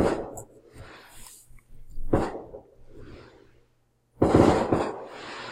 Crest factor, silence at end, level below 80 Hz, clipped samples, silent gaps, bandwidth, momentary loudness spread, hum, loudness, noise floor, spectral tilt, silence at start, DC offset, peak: 24 dB; 0 s; -40 dBFS; under 0.1%; none; 16 kHz; 28 LU; none; -25 LUFS; -67 dBFS; -7 dB/octave; 0 s; under 0.1%; -4 dBFS